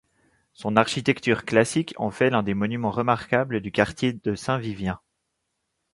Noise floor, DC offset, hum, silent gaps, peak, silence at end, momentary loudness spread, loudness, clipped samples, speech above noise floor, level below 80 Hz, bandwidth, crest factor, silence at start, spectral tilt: -78 dBFS; under 0.1%; none; none; -2 dBFS; 1 s; 8 LU; -24 LUFS; under 0.1%; 54 dB; -54 dBFS; 11.5 kHz; 22 dB; 0.6 s; -5.5 dB/octave